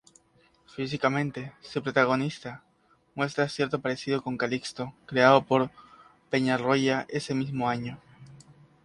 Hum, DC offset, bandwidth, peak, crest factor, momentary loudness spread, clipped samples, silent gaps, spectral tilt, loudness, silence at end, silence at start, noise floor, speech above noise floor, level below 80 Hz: none; under 0.1%; 11.5 kHz; -4 dBFS; 24 dB; 17 LU; under 0.1%; none; -5.5 dB/octave; -27 LUFS; 0.45 s; 0.8 s; -64 dBFS; 37 dB; -66 dBFS